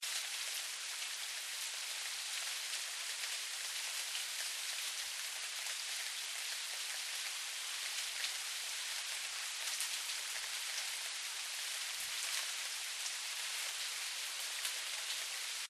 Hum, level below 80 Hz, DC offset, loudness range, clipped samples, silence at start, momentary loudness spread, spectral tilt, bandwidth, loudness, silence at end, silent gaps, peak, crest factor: none; under -90 dBFS; under 0.1%; 1 LU; under 0.1%; 0 s; 2 LU; 5.5 dB/octave; 16 kHz; -39 LUFS; 0 s; none; -18 dBFS; 24 dB